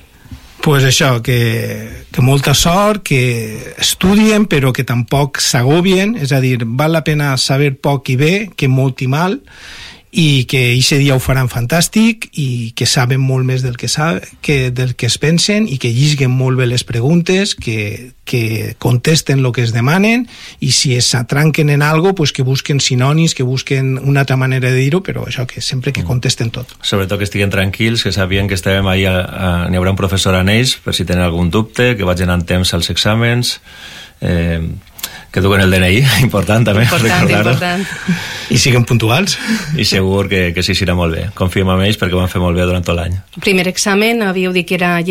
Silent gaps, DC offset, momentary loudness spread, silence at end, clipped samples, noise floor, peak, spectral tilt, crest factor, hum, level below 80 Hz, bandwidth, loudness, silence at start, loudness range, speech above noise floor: none; under 0.1%; 8 LU; 0 s; under 0.1%; -35 dBFS; 0 dBFS; -5 dB/octave; 12 dB; none; -34 dBFS; 16.5 kHz; -13 LUFS; 0.3 s; 3 LU; 22 dB